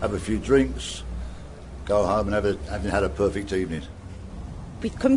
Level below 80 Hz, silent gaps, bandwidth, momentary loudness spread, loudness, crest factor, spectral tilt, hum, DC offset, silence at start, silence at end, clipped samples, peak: -36 dBFS; none; 11 kHz; 18 LU; -25 LUFS; 18 dB; -6 dB/octave; none; under 0.1%; 0 s; 0 s; under 0.1%; -8 dBFS